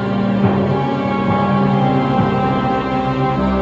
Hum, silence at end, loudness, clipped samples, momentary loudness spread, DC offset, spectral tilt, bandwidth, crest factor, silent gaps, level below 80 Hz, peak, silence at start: none; 0 s; -16 LUFS; under 0.1%; 3 LU; under 0.1%; -9 dB/octave; 7.4 kHz; 14 dB; none; -36 dBFS; -2 dBFS; 0 s